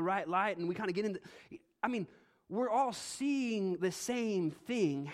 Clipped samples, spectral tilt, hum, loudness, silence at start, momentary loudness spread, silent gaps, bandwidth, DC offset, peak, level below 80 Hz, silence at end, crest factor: under 0.1%; -5 dB/octave; none; -35 LUFS; 0 s; 11 LU; none; 15.5 kHz; under 0.1%; -18 dBFS; -78 dBFS; 0 s; 18 dB